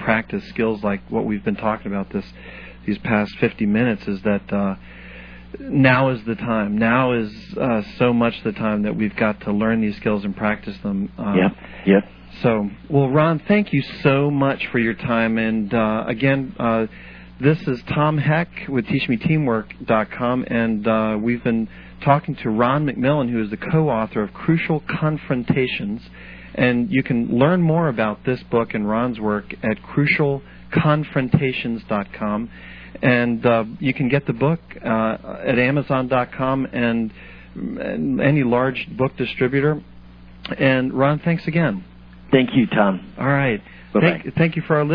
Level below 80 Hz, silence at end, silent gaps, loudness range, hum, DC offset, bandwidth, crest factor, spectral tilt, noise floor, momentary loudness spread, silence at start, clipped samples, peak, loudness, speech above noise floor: -46 dBFS; 0 s; none; 2 LU; none; under 0.1%; 5.4 kHz; 20 dB; -10 dB/octave; -42 dBFS; 9 LU; 0 s; under 0.1%; 0 dBFS; -20 LUFS; 22 dB